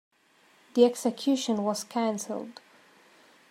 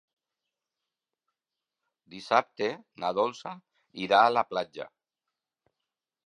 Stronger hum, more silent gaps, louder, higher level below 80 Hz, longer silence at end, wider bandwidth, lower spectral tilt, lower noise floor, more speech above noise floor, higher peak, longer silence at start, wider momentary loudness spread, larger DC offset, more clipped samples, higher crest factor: neither; neither; about the same, -28 LUFS vs -27 LUFS; about the same, -82 dBFS vs -78 dBFS; second, 1 s vs 1.4 s; first, 16 kHz vs 10.5 kHz; about the same, -4.5 dB/octave vs -4.5 dB/octave; second, -63 dBFS vs -89 dBFS; second, 36 dB vs 61 dB; about the same, -8 dBFS vs -6 dBFS; second, 0.75 s vs 2.1 s; second, 13 LU vs 23 LU; neither; neither; about the same, 22 dB vs 26 dB